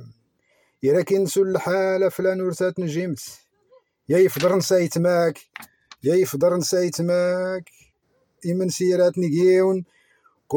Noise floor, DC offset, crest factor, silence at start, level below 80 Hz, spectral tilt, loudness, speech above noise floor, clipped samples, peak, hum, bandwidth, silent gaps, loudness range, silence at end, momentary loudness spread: -67 dBFS; under 0.1%; 14 dB; 0 s; -68 dBFS; -5.5 dB/octave; -21 LUFS; 47 dB; under 0.1%; -8 dBFS; none; 18 kHz; none; 2 LU; 0 s; 10 LU